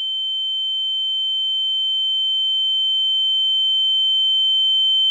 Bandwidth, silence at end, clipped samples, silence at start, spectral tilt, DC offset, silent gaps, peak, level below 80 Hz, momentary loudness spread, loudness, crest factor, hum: 11.5 kHz; 0 s; under 0.1%; 0 s; 8 dB/octave; under 0.1%; none; -14 dBFS; under -90 dBFS; 5 LU; -16 LUFS; 6 dB; none